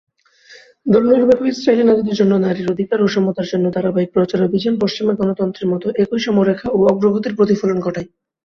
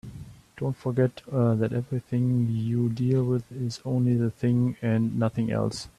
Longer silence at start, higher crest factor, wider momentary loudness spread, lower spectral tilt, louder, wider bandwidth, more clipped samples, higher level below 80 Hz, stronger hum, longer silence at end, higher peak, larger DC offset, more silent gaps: first, 0.5 s vs 0.05 s; about the same, 16 dB vs 14 dB; about the same, 7 LU vs 8 LU; about the same, -7.5 dB/octave vs -8 dB/octave; first, -16 LUFS vs -26 LUFS; second, 7 kHz vs 11 kHz; neither; about the same, -54 dBFS vs -58 dBFS; neither; first, 0.4 s vs 0.1 s; first, 0 dBFS vs -10 dBFS; neither; neither